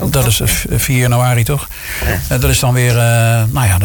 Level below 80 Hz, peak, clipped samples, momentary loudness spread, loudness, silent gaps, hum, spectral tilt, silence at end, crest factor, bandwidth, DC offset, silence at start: -24 dBFS; -2 dBFS; under 0.1%; 6 LU; -13 LUFS; none; none; -4.5 dB/octave; 0 s; 10 dB; 19.5 kHz; under 0.1%; 0 s